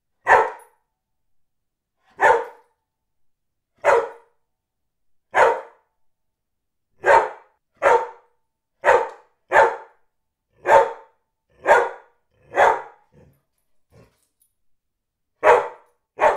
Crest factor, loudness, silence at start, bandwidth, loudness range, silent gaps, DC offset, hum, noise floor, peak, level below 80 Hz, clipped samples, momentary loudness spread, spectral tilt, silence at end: 22 dB; -19 LUFS; 0.25 s; 14.5 kHz; 6 LU; none; under 0.1%; none; -79 dBFS; 0 dBFS; -58 dBFS; under 0.1%; 13 LU; -3 dB/octave; 0 s